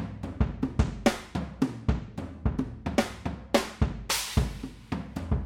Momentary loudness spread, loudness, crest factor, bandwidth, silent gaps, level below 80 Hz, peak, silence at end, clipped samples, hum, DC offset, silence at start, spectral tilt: 10 LU; -30 LUFS; 24 dB; 18 kHz; none; -36 dBFS; -6 dBFS; 0 s; under 0.1%; none; under 0.1%; 0 s; -5 dB/octave